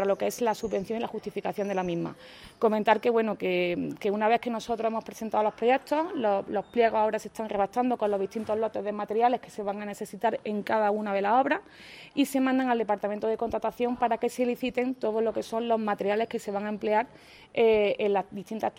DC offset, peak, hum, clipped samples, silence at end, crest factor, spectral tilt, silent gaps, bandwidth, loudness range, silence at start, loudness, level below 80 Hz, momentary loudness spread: under 0.1%; -8 dBFS; none; under 0.1%; 0.05 s; 20 dB; -5.5 dB/octave; none; 16 kHz; 2 LU; 0 s; -28 LUFS; -62 dBFS; 9 LU